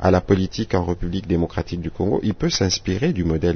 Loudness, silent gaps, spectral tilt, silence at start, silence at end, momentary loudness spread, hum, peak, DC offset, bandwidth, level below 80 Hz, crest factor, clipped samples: -22 LUFS; none; -5.5 dB/octave; 0 s; 0 s; 6 LU; none; -4 dBFS; under 0.1%; 6.6 kHz; -36 dBFS; 16 dB; under 0.1%